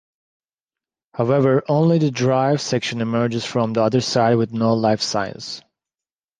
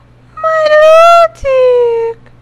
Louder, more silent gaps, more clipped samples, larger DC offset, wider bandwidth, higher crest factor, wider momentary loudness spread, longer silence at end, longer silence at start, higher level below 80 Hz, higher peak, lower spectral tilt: second, -19 LUFS vs -7 LUFS; neither; second, under 0.1% vs 4%; neither; second, 9.8 kHz vs 12.5 kHz; first, 16 dB vs 8 dB; second, 8 LU vs 13 LU; first, 0.8 s vs 0.3 s; first, 1.15 s vs 0.35 s; second, -60 dBFS vs -38 dBFS; second, -4 dBFS vs 0 dBFS; first, -6 dB/octave vs -2.5 dB/octave